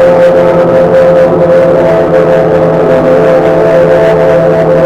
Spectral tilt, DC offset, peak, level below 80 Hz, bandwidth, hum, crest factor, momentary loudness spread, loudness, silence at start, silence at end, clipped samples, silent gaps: -8 dB/octave; 0.5%; 0 dBFS; -32 dBFS; 8.6 kHz; none; 4 dB; 2 LU; -6 LUFS; 0 s; 0 s; 2%; none